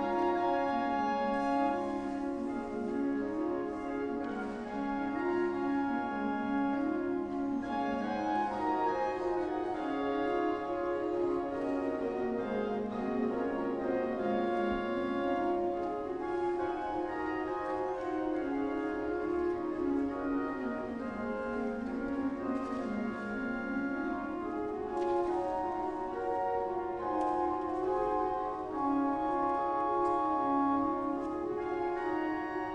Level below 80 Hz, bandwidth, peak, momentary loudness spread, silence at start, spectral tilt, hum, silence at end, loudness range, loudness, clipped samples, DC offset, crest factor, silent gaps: -58 dBFS; 9.6 kHz; -20 dBFS; 5 LU; 0 s; -7 dB/octave; none; 0 s; 3 LU; -34 LUFS; under 0.1%; under 0.1%; 14 dB; none